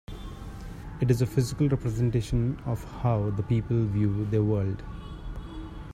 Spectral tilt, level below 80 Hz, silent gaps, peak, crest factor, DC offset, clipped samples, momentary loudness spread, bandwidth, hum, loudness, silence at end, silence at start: -8 dB/octave; -42 dBFS; none; -10 dBFS; 18 dB; under 0.1%; under 0.1%; 16 LU; 14.5 kHz; none; -27 LUFS; 0 s; 0.1 s